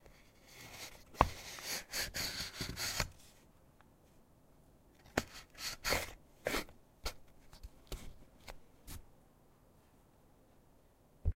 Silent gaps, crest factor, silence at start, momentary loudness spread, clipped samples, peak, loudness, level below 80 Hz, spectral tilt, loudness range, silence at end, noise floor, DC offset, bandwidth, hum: none; 38 dB; 0.05 s; 23 LU; under 0.1%; -6 dBFS; -40 LUFS; -52 dBFS; -2.5 dB/octave; 17 LU; 0.05 s; -66 dBFS; under 0.1%; 16 kHz; none